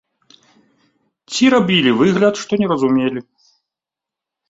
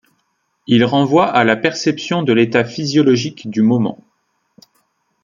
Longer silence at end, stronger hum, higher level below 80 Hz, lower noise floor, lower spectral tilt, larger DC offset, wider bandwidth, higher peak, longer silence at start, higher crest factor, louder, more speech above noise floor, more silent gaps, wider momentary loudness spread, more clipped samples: about the same, 1.3 s vs 1.3 s; neither; about the same, -58 dBFS vs -58 dBFS; first, -86 dBFS vs -67 dBFS; about the same, -5 dB/octave vs -6 dB/octave; neither; about the same, 8 kHz vs 7.4 kHz; about the same, -2 dBFS vs -2 dBFS; first, 1.3 s vs 0.7 s; about the same, 16 dB vs 16 dB; about the same, -15 LUFS vs -15 LUFS; first, 71 dB vs 52 dB; neither; first, 9 LU vs 6 LU; neither